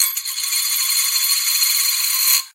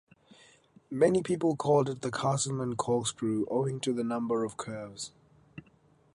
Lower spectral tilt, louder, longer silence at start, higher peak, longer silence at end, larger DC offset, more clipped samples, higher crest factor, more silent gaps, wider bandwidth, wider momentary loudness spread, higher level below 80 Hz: second, 9.5 dB/octave vs -5.5 dB/octave; first, -15 LUFS vs -30 LUFS; second, 0 s vs 0.9 s; first, -2 dBFS vs -12 dBFS; second, 0.05 s vs 0.55 s; neither; neither; about the same, 18 dB vs 20 dB; neither; first, 16 kHz vs 11.5 kHz; second, 4 LU vs 13 LU; second, -86 dBFS vs -66 dBFS